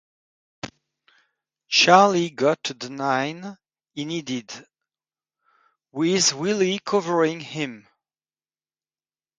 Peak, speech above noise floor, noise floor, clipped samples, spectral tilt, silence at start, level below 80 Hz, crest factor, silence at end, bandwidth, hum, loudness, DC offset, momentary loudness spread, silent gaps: -2 dBFS; over 68 dB; under -90 dBFS; under 0.1%; -3 dB/octave; 0.65 s; -70 dBFS; 24 dB; 1.6 s; 9.6 kHz; none; -21 LUFS; under 0.1%; 23 LU; none